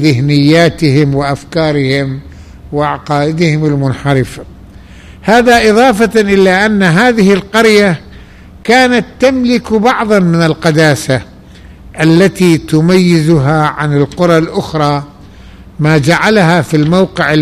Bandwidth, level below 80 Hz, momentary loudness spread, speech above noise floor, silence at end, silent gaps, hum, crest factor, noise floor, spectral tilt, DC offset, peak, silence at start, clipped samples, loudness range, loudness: 15 kHz; -36 dBFS; 8 LU; 25 dB; 0 s; none; none; 10 dB; -34 dBFS; -6 dB/octave; 0.2%; 0 dBFS; 0 s; under 0.1%; 5 LU; -9 LUFS